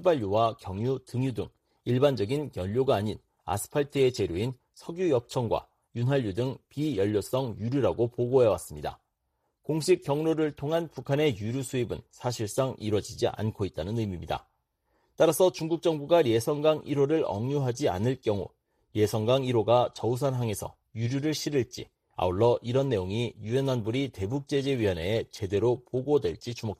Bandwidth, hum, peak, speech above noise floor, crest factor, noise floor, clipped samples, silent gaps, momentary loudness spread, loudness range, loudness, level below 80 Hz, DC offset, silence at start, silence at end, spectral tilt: 15 kHz; none; -10 dBFS; 50 dB; 18 dB; -78 dBFS; under 0.1%; none; 10 LU; 3 LU; -28 LUFS; -56 dBFS; under 0.1%; 0 s; 0.05 s; -6.5 dB/octave